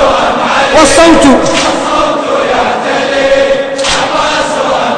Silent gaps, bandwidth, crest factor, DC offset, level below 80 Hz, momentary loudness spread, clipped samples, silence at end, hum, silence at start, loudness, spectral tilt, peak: none; 11 kHz; 8 dB; under 0.1%; -30 dBFS; 7 LU; 3%; 0 s; none; 0 s; -8 LUFS; -3 dB/octave; 0 dBFS